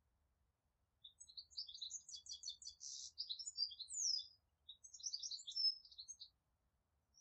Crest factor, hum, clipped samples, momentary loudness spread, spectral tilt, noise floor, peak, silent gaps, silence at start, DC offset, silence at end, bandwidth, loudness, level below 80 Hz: 20 dB; none; under 0.1%; 21 LU; 3.5 dB/octave; -86 dBFS; -30 dBFS; none; 1.05 s; under 0.1%; 0 s; 8.8 kHz; -45 LUFS; -86 dBFS